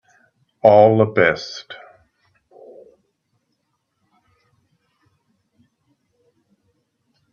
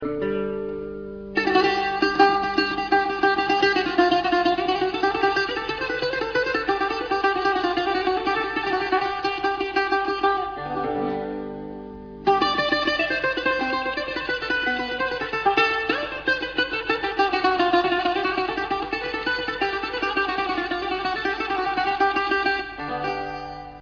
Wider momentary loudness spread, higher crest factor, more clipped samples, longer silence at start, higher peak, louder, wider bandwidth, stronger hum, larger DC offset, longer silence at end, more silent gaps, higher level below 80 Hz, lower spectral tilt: first, 25 LU vs 8 LU; about the same, 22 dB vs 20 dB; neither; first, 0.65 s vs 0 s; first, 0 dBFS vs -4 dBFS; first, -15 LUFS vs -23 LUFS; first, 7 kHz vs 5.4 kHz; neither; neither; first, 5.6 s vs 0 s; neither; second, -64 dBFS vs -50 dBFS; first, -6.5 dB/octave vs -4.5 dB/octave